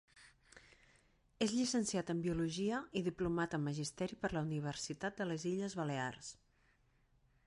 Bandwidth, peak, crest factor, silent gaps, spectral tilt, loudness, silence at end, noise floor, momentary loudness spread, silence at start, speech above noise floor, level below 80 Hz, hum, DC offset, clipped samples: 11.5 kHz; -24 dBFS; 18 dB; none; -5 dB/octave; -39 LUFS; 1.15 s; -74 dBFS; 6 LU; 0.15 s; 35 dB; -64 dBFS; none; under 0.1%; under 0.1%